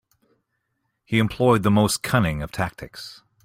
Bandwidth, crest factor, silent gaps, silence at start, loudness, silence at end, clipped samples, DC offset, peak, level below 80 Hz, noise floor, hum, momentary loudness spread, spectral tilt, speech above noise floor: 16 kHz; 18 dB; none; 1.1 s; -21 LUFS; 0.3 s; under 0.1%; under 0.1%; -4 dBFS; -46 dBFS; -75 dBFS; none; 18 LU; -5.5 dB/octave; 54 dB